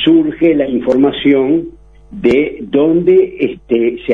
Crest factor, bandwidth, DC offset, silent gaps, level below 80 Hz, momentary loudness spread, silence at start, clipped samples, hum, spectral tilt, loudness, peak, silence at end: 12 dB; 5.4 kHz; 0.1%; none; -42 dBFS; 6 LU; 0 s; under 0.1%; none; -8 dB/octave; -13 LUFS; 0 dBFS; 0 s